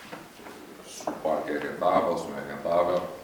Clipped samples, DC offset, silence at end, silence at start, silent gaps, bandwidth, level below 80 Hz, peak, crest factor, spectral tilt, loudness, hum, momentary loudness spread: under 0.1%; under 0.1%; 0 s; 0 s; none; over 20 kHz; -64 dBFS; -10 dBFS; 18 dB; -5 dB/octave; -28 LUFS; none; 19 LU